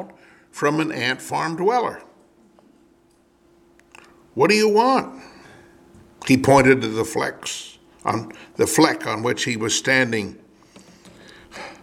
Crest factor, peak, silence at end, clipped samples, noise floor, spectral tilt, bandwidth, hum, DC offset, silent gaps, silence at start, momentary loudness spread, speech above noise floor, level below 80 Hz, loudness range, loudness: 22 dB; 0 dBFS; 0.1 s; under 0.1%; -58 dBFS; -4 dB/octave; 16.5 kHz; none; under 0.1%; none; 0 s; 21 LU; 38 dB; -54 dBFS; 6 LU; -20 LUFS